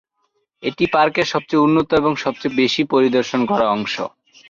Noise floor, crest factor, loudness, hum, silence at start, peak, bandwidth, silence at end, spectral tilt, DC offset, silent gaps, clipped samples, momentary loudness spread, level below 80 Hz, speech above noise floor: -69 dBFS; 14 dB; -18 LUFS; none; 0.6 s; -4 dBFS; 7.4 kHz; 0.4 s; -5.5 dB/octave; under 0.1%; none; under 0.1%; 9 LU; -54 dBFS; 52 dB